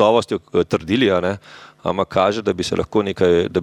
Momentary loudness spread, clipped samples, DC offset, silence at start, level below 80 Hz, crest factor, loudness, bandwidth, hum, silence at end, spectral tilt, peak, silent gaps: 8 LU; under 0.1%; under 0.1%; 0 s; -48 dBFS; 16 dB; -19 LUFS; 12 kHz; none; 0 s; -5.5 dB/octave; -2 dBFS; none